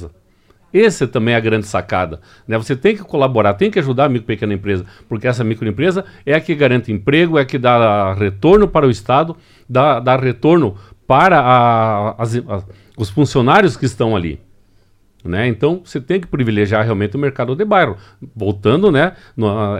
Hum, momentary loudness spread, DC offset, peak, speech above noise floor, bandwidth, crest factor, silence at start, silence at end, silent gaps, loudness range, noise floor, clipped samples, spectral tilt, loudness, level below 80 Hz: none; 11 LU; under 0.1%; 0 dBFS; 38 dB; 11 kHz; 14 dB; 0 s; 0 s; none; 4 LU; -52 dBFS; under 0.1%; -7 dB/octave; -15 LUFS; -42 dBFS